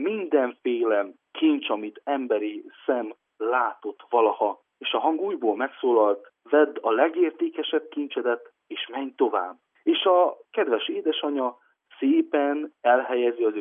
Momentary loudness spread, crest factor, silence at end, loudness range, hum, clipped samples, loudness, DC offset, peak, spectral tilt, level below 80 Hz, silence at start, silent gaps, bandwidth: 10 LU; 18 dB; 0 s; 3 LU; none; under 0.1%; -25 LUFS; under 0.1%; -6 dBFS; -7.5 dB/octave; under -90 dBFS; 0 s; none; 3.7 kHz